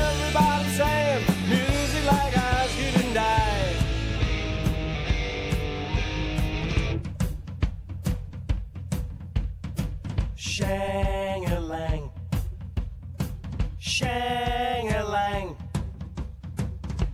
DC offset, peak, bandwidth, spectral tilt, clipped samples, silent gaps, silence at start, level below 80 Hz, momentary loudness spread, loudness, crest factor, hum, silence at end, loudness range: under 0.1%; -6 dBFS; 16 kHz; -5 dB/octave; under 0.1%; none; 0 s; -32 dBFS; 10 LU; -27 LUFS; 20 dB; none; 0 s; 7 LU